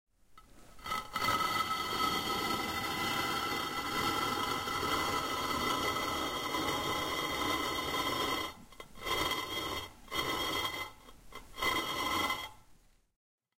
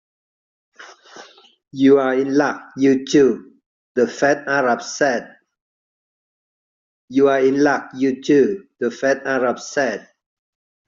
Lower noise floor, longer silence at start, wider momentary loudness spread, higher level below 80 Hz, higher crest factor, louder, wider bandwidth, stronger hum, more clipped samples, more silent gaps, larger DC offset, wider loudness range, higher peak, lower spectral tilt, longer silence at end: first, -62 dBFS vs -44 dBFS; second, 0.3 s vs 0.8 s; about the same, 8 LU vs 9 LU; first, -56 dBFS vs -64 dBFS; about the same, 18 dB vs 16 dB; second, -34 LUFS vs -18 LUFS; first, 16 kHz vs 7.6 kHz; neither; neither; second, none vs 3.66-3.95 s, 5.61-7.08 s; neither; about the same, 3 LU vs 4 LU; second, -18 dBFS vs -4 dBFS; second, -2.5 dB/octave vs -4 dB/octave; about the same, 0.85 s vs 0.9 s